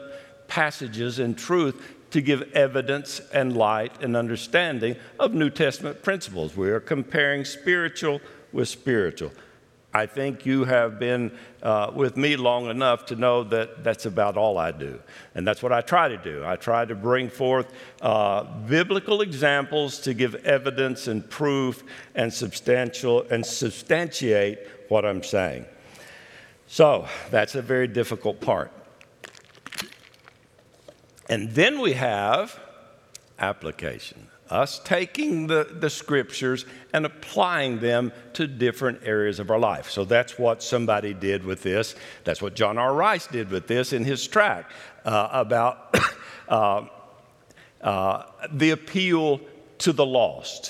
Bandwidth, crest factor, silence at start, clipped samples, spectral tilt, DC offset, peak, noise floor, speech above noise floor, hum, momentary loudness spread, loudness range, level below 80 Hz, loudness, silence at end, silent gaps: 15.5 kHz; 24 dB; 0 s; under 0.1%; -5 dB/octave; under 0.1%; 0 dBFS; -57 dBFS; 33 dB; none; 10 LU; 3 LU; -62 dBFS; -24 LUFS; 0 s; none